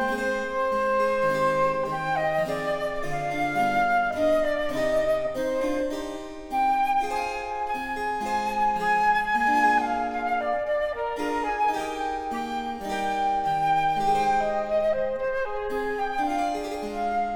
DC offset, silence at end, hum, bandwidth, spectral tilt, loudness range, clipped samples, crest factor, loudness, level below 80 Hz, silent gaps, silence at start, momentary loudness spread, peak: under 0.1%; 0 s; none; 18 kHz; -4.5 dB/octave; 3 LU; under 0.1%; 14 dB; -25 LUFS; -48 dBFS; none; 0 s; 7 LU; -10 dBFS